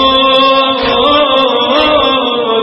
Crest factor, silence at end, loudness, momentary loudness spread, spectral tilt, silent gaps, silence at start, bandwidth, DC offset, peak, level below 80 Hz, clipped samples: 10 dB; 0 s; -9 LUFS; 3 LU; -5 dB/octave; none; 0 s; 5.8 kHz; under 0.1%; 0 dBFS; -38 dBFS; 0.1%